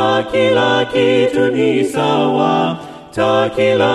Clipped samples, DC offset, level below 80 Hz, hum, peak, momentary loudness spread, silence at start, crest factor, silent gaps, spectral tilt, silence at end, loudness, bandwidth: under 0.1%; under 0.1%; -50 dBFS; none; -2 dBFS; 5 LU; 0 s; 12 dB; none; -5.5 dB/octave; 0 s; -14 LUFS; 12.5 kHz